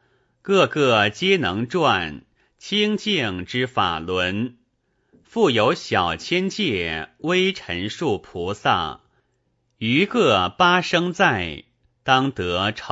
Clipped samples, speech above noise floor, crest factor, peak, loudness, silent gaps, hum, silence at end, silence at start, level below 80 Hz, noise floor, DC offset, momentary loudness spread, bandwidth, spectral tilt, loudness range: under 0.1%; 48 dB; 20 dB; -2 dBFS; -21 LUFS; none; none; 0 s; 0.45 s; -52 dBFS; -69 dBFS; under 0.1%; 11 LU; 8 kHz; -5 dB/octave; 4 LU